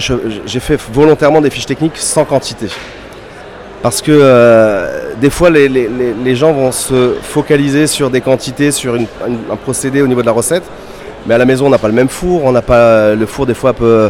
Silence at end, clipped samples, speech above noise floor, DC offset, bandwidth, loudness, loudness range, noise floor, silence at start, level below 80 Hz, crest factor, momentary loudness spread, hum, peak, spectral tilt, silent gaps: 0 s; 0.5%; 20 dB; under 0.1%; 16.5 kHz; -11 LUFS; 4 LU; -30 dBFS; 0 s; -34 dBFS; 10 dB; 14 LU; none; 0 dBFS; -5 dB/octave; none